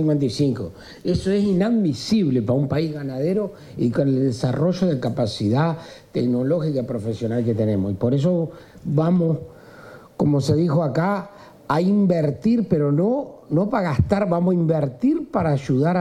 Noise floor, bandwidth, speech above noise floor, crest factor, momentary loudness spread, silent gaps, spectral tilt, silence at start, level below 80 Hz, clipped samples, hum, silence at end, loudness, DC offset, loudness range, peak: -43 dBFS; 12 kHz; 23 dB; 16 dB; 7 LU; none; -8 dB/octave; 0 s; -50 dBFS; under 0.1%; none; 0 s; -21 LUFS; under 0.1%; 2 LU; -4 dBFS